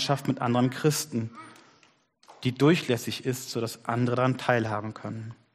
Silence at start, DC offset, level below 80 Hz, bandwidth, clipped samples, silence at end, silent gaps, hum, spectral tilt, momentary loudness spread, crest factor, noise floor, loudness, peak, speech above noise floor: 0 s; under 0.1%; -66 dBFS; 15 kHz; under 0.1%; 0.2 s; none; none; -5.5 dB/octave; 14 LU; 20 dB; -63 dBFS; -27 LUFS; -8 dBFS; 36 dB